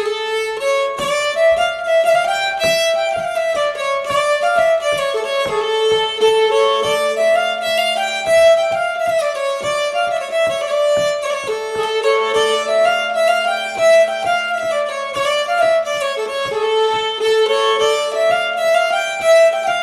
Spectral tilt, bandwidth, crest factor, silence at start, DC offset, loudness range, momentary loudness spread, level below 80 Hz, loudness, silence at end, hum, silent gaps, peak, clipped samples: -1 dB/octave; 13.5 kHz; 12 dB; 0 s; under 0.1%; 2 LU; 6 LU; -54 dBFS; -16 LUFS; 0 s; none; none; -4 dBFS; under 0.1%